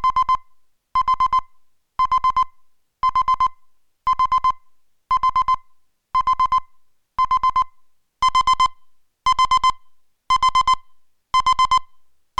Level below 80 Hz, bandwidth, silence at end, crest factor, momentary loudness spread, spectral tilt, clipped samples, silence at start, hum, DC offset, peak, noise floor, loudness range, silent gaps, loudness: -42 dBFS; 11 kHz; 0.55 s; 14 dB; 7 LU; -0.5 dB/octave; under 0.1%; 0 s; none; under 0.1%; -8 dBFS; -55 dBFS; 2 LU; none; -19 LUFS